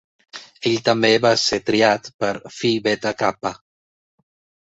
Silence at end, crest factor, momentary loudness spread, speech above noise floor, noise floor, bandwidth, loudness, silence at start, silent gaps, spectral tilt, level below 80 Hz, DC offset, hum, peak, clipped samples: 1.15 s; 20 dB; 14 LU; over 71 dB; under -90 dBFS; 8.2 kHz; -19 LUFS; 0.35 s; 2.14-2.19 s; -4 dB/octave; -58 dBFS; under 0.1%; none; -2 dBFS; under 0.1%